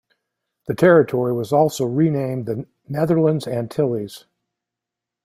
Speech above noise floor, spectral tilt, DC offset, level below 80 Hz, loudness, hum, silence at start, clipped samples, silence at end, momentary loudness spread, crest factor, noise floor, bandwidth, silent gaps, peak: 67 dB; -7 dB/octave; under 0.1%; -60 dBFS; -19 LUFS; none; 0.7 s; under 0.1%; 1.05 s; 15 LU; 18 dB; -85 dBFS; 15.5 kHz; none; -2 dBFS